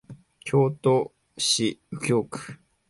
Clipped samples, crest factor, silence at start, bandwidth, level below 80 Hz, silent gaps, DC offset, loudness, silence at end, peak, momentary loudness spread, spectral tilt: under 0.1%; 16 dB; 0.1 s; 11.5 kHz; -64 dBFS; none; under 0.1%; -24 LUFS; 0.35 s; -10 dBFS; 15 LU; -4.5 dB/octave